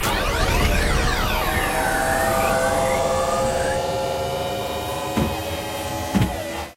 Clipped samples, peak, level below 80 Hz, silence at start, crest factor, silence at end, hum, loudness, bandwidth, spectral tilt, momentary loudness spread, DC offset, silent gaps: under 0.1%; -6 dBFS; -30 dBFS; 0 s; 14 dB; 0.05 s; none; -22 LUFS; 16 kHz; -4 dB/octave; 7 LU; under 0.1%; none